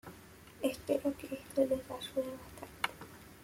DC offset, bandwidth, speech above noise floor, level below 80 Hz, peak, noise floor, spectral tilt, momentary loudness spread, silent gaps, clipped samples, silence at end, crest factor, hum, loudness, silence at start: under 0.1%; 16.5 kHz; 20 dB; -64 dBFS; -16 dBFS; -55 dBFS; -4.5 dB/octave; 19 LU; none; under 0.1%; 0 s; 22 dB; none; -37 LUFS; 0.05 s